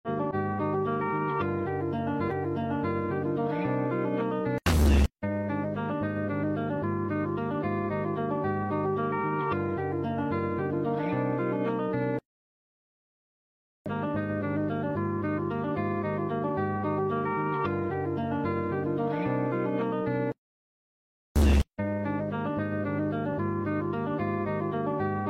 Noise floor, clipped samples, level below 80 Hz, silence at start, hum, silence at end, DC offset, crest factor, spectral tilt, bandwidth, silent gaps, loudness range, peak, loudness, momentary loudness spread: under -90 dBFS; under 0.1%; -38 dBFS; 0.05 s; none; 0 s; under 0.1%; 16 dB; -7.5 dB/octave; 15.5 kHz; 12.25-13.85 s, 20.38-21.35 s; 4 LU; -12 dBFS; -29 LUFS; 2 LU